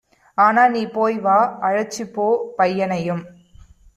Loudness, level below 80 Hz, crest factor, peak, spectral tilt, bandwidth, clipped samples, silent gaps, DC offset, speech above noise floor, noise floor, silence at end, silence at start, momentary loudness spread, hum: -19 LUFS; -56 dBFS; 16 dB; -2 dBFS; -5.5 dB/octave; 14 kHz; under 0.1%; none; under 0.1%; 29 dB; -47 dBFS; 0.65 s; 0.4 s; 11 LU; none